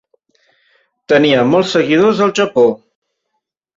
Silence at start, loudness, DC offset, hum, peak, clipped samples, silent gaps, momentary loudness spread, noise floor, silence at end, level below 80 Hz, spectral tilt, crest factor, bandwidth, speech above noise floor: 1.1 s; -12 LUFS; under 0.1%; none; -2 dBFS; under 0.1%; none; 4 LU; -73 dBFS; 1 s; -56 dBFS; -5.5 dB/octave; 14 dB; 7.8 kHz; 61 dB